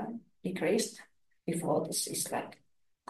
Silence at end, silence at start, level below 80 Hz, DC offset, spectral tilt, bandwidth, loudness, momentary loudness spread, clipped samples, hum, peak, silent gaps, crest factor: 0.55 s; 0 s; -76 dBFS; under 0.1%; -4 dB/octave; 12.5 kHz; -34 LUFS; 12 LU; under 0.1%; none; -18 dBFS; none; 18 dB